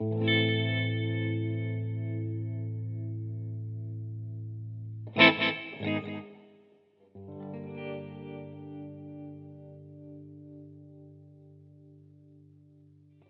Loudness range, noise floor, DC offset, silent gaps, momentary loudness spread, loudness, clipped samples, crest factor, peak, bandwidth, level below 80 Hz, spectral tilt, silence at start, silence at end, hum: 21 LU; -63 dBFS; under 0.1%; none; 23 LU; -30 LUFS; under 0.1%; 28 dB; -6 dBFS; 5.8 kHz; -78 dBFS; -8 dB/octave; 0 s; 0.9 s; none